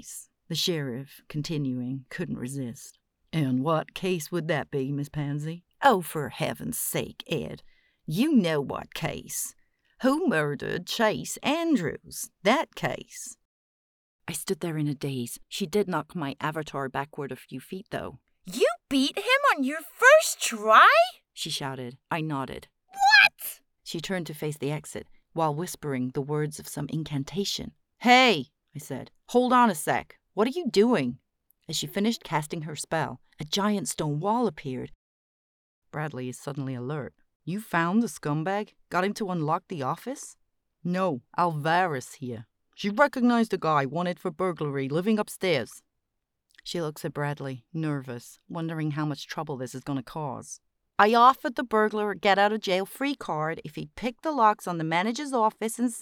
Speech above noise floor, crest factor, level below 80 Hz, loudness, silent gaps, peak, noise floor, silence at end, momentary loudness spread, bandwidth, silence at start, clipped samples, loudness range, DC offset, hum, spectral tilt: 54 dB; 24 dB; -64 dBFS; -26 LUFS; 13.45-14.19 s, 34.95-35.82 s, 37.35-37.40 s; -4 dBFS; -81 dBFS; 0 s; 16 LU; over 20 kHz; 0.05 s; under 0.1%; 10 LU; under 0.1%; none; -4.5 dB/octave